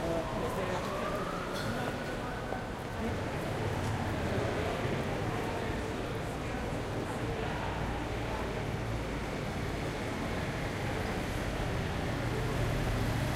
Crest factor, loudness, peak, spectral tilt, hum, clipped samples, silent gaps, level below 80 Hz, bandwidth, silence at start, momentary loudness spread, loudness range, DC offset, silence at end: 16 dB; -35 LUFS; -18 dBFS; -6 dB/octave; none; under 0.1%; none; -44 dBFS; 16 kHz; 0 s; 4 LU; 2 LU; under 0.1%; 0 s